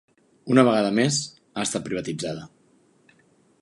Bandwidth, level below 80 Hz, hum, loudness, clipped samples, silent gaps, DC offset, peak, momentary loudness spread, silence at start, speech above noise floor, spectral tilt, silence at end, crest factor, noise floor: 11.5 kHz; -64 dBFS; none; -23 LUFS; under 0.1%; none; under 0.1%; -4 dBFS; 15 LU; 0.45 s; 38 dB; -4.5 dB/octave; 1.15 s; 22 dB; -61 dBFS